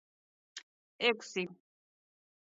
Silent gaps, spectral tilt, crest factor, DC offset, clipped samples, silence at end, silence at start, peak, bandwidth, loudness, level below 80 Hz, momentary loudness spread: 0.63-0.99 s; -1 dB/octave; 26 dB; under 0.1%; under 0.1%; 0.9 s; 0.55 s; -14 dBFS; 7.6 kHz; -34 LUFS; under -90 dBFS; 20 LU